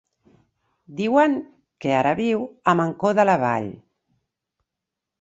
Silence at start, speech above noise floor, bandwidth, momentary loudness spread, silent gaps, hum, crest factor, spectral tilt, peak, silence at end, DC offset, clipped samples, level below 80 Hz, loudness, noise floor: 0.9 s; 65 dB; 8 kHz; 11 LU; none; none; 20 dB; -7 dB/octave; -4 dBFS; 1.45 s; under 0.1%; under 0.1%; -64 dBFS; -21 LUFS; -85 dBFS